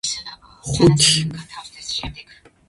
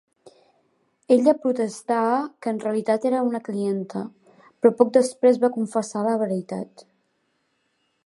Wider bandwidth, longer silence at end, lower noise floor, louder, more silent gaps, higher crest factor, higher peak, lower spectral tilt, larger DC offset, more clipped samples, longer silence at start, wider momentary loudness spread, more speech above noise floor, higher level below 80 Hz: about the same, 11.5 kHz vs 11.5 kHz; second, 0.45 s vs 1.4 s; second, -38 dBFS vs -71 dBFS; first, -18 LUFS vs -22 LUFS; neither; about the same, 20 dB vs 22 dB; about the same, -2 dBFS vs -2 dBFS; second, -4 dB/octave vs -6 dB/octave; neither; neither; second, 0.05 s vs 1.1 s; first, 22 LU vs 12 LU; second, 20 dB vs 49 dB; first, -42 dBFS vs -78 dBFS